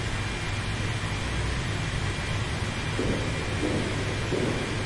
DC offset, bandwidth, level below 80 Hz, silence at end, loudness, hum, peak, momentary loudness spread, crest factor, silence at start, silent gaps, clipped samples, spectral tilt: under 0.1%; 11.5 kHz; -38 dBFS; 0 s; -29 LUFS; none; -14 dBFS; 2 LU; 14 dB; 0 s; none; under 0.1%; -5 dB/octave